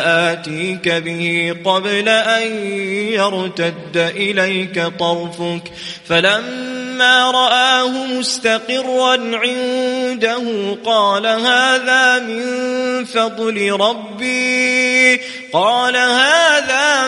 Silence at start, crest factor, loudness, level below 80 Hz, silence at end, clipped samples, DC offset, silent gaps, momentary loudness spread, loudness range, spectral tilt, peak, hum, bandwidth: 0 s; 16 dB; -15 LUFS; -62 dBFS; 0 s; under 0.1%; under 0.1%; none; 9 LU; 4 LU; -3 dB/octave; 0 dBFS; none; 11.5 kHz